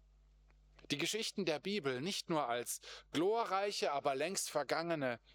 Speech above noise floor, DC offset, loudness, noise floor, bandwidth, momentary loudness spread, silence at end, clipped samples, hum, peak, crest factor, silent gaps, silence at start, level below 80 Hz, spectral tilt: 28 dB; under 0.1%; -38 LUFS; -66 dBFS; over 20 kHz; 4 LU; 0.15 s; under 0.1%; none; -20 dBFS; 20 dB; none; 0.9 s; -72 dBFS; -3 dB/octave